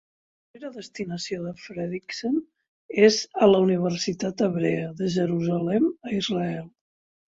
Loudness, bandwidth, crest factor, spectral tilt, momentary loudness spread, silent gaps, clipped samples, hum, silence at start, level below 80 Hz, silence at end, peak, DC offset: -24 LUFS; 7.8 kHz; 20 dB; -5.5 dB/octave; 16 LU; 2.68-2.89 s; under 0.1%; none; 0.55 s; -64 dBFS; 0.6 s; -6 dBFS; under 0.1%